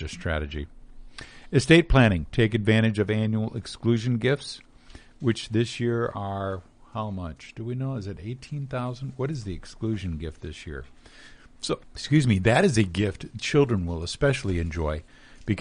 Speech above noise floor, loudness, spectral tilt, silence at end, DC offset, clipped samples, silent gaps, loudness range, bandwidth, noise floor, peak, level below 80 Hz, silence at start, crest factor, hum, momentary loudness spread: 24 dB; -25 LUFS; -6 dB/octave; 0 s; under 0.1%; under 0.1%; none; 10 LU; 10 kHz; -49 dBFS; -4 dBFS; -40 dBFS; 0 s; 22 dB; none; 17 LU